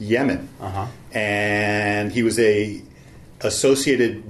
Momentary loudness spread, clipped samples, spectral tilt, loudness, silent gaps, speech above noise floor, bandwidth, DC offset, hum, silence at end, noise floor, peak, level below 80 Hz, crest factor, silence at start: 12 LU; under 0.1%; -4.5 dB/octave; -21 LUFS; none; 24 dB; 13.5 kHz; under 0.1%; none; 0 s; -44 dBFS; -6 dBFS; -50 dBFS; 16 dB; 0 s